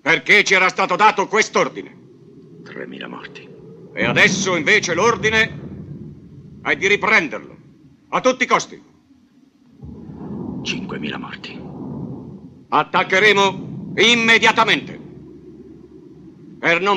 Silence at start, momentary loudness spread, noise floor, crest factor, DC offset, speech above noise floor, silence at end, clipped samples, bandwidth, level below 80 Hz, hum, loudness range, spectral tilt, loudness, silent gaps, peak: 0.05 s; 23 LU; -53 dBFS; 18 dB; under 0.1%; 36 dB; 0 s; under 0.1%; 14 kHz; -54 dBFS; none; 11 LU; -3 dB/octave; -16 LUFS; none; -2 dBFS